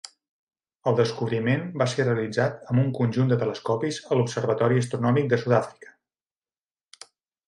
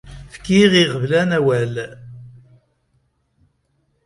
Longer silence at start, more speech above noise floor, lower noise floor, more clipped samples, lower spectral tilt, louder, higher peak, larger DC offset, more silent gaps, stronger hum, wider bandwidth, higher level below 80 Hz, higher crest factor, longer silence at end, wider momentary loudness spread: first, 0.85 s vs 0.05 s; first, over 66 dB vs 50 dB; first, under -90 dBFS vs -66 dBFS; neither; about the same, -6.5 dB/octave vs -5.5 dB/octave; second, -24 LUFS vs -16 LUFS; second, -8 dBFS vs 0 dBFS; neither; neither; neither; about the same, 11 kHz vs 11.5 kHz; second, -66 dBFS vs -48 dBFS; about the same, 18 dB vs 20 dB; about the same, 1.75 s vs 1.75 s; second, 4 LU vs 26 LU